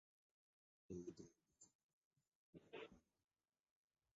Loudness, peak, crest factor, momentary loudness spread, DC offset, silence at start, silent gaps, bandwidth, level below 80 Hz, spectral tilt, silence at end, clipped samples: -59 LUFS; -42 dBFS; 22 dB; 9 LU; under 0.1%; 0.9 s; 1.75-2.11 s, 2.28-2.53 s; 7.4 kHz; -84 dBFS; -5.5 dB/octave; 1.15 s; under 0.1%